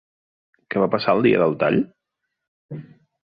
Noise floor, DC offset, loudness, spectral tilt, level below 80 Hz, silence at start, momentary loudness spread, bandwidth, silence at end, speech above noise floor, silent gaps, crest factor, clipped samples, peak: -80 dBFS; under 0.1%; -20 LUFS; -10 dB/octave; -60 dBFS; 0.7 s; 21 LU; 5.2 kHz; 0.4 s; 61 dB; 2.48-2.69 s; 18 dB; under 0.1%; -4 dBFS